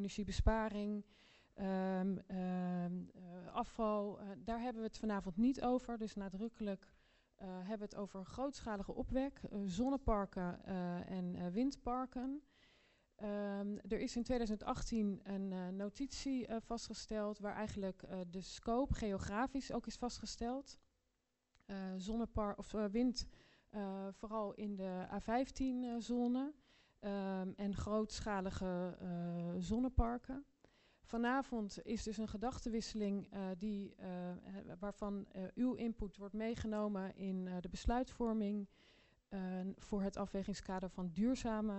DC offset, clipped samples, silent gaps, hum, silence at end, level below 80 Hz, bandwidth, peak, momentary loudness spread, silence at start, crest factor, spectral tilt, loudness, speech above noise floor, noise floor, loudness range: under 0.1%; under 0.1%; none; none; 0 s; -54 dBFS; 8.2 kHz; -20 dBFS; 9 LU; 0 s; 22 dB; -6.5 dB/octave; -42 LUFS; 44 dB; -85 dBFS; 3 LU